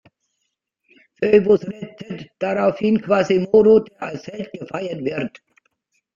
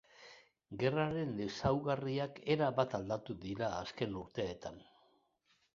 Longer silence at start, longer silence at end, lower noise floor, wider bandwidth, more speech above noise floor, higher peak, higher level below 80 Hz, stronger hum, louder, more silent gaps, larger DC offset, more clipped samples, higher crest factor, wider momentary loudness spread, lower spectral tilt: first, 1.2 s vs 0.2 s; about the same, 0.9 s vs 0.9 s; about the same, -76 dBFS vs -76 dBFS; about the same, 7.4 kHz vs 7.4 kHz; first, 57 dB vs 39 dB; first, -2 dBFS vs -16 dBFS; about the same, -58 dBFS vs -62 dBFS; neither; first, -18 LUFS vs -37 LUFS; neither; neither; neither; about the same, 18 dB vs 22 dB; first, 18 LU vs 15 LU; first, -7.5 dB/octave vs -5.5 dB/octave